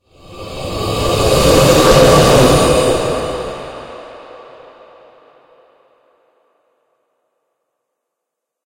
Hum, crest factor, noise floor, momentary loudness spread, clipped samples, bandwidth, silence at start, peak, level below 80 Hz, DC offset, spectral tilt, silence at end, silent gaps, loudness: none; 16 dB; -79 dBFS; 23 LU; under 0.1%; 16.5 kHz; 0.3 s; 0 dBFS; -28 dBFS; under 0.1%; -4.5 dB/octave; 4.3 s; none; -11 LUFS